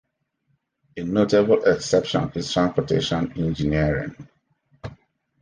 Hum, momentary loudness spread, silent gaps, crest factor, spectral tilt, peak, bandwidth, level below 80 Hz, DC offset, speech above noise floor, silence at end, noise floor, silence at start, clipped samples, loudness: none; 22 LU; none; 18 dB; -6 dB/octave; -4 dBFS; 10 kHz; -44 dBFS; under 0.1%; 50 dB; 0.45 s; -71 dBFS; 0.95 s; under 0.1%; -22 LUFS